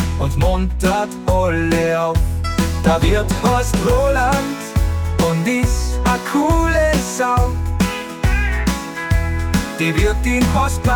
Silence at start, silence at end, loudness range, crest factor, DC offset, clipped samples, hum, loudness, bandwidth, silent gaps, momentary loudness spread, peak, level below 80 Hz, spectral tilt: 0 s; 0 s; 2 LU; 12 dB; under 0.1%; under 0.1%; none; -17 LUFS; 18 kHz; none; 4 LU; -4 dBFS; -22 dBFS; -5.5 dB/octave